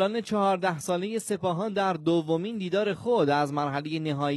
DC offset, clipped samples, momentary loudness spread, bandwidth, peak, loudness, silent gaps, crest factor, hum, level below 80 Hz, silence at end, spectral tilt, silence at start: under 0.1%; under 0.1%; 5 LU; 12.5 kHz; -12 dBFS; -27 LUFS; none; 14 dB; none; -70 dBFS; 0 s; -5.5 dB/octave; 0 s